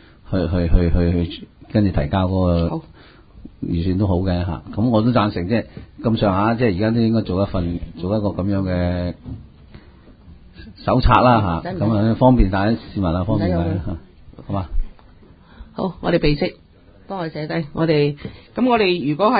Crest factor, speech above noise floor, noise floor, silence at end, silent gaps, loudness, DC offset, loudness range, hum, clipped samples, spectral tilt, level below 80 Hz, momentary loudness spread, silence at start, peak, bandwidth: 20 dB; 28 dB; -46 dBFS; 0 s; none; -19 LUFS; under 0.1%; 7 LU; none; under 0.1%; -11 dB/octave; -30 dBFS; 13 LU; 0.3 s; 0 dBFS; 5 kHz